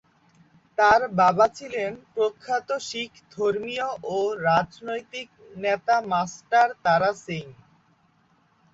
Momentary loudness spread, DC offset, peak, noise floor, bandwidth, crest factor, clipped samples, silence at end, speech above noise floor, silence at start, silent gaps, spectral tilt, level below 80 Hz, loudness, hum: 14 LU; under 0.1%; -6 dBFS; -63 dBFS; 7.8 kHz; 20 dB; under 0.1%; 1.2 s; 39 dB; 0.8 s; none; -4.5 dB/octave; -62 dBFS; -24 LUFS; none